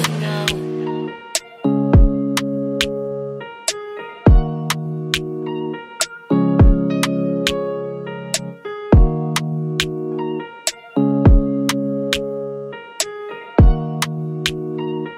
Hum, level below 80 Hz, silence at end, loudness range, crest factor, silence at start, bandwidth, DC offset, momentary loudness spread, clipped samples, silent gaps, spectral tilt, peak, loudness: none; -22 dBFS; 0 s; 3 LU; 18 dB; 0 s; 16 kHz; under 0.1%; 12 LU; under 0.1%; none; -5 dB/octave; 0 dBFS; -19 LUFS